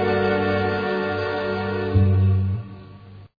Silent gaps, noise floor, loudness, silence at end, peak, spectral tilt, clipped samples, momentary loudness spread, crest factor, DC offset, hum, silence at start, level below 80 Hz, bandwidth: none; -42 dBFS; -22 LUFS; 0.15 s; -6 dBFS; -9.5 dB/octave; under 0.1%; 9 LU; 14 dB; under 0.1%; none; 0 s; -44 dBFS; 5 kHz